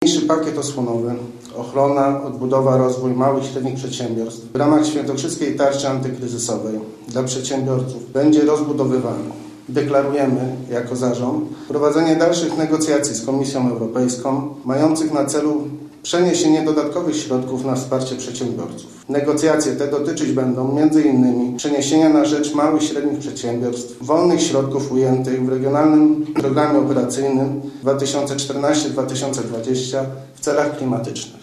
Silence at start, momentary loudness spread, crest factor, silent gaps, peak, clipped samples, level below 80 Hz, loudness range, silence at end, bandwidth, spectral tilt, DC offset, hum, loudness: 0 s; 9 LU; 16 dB; none; -2 dBFS; under 0.1%; -60 dBFS; 4 LU; 0.05 s; 13 kHz; -5.5 dB/octave; under 0.1%; none; -18 LUFS